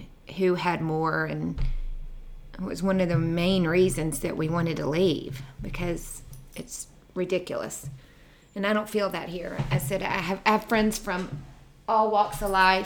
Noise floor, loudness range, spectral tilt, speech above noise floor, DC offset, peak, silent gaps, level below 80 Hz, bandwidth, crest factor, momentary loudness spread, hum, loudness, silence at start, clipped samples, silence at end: -53 dBFS; 6 LU; -5.5 dB/octave; 27 dB; under 0.1%; -6 dBFS; none; -40 dBFS; 20 kHz; 22 dB; 17 LU; none; -27 LUFS; 0 s; under 0.1%; 0 s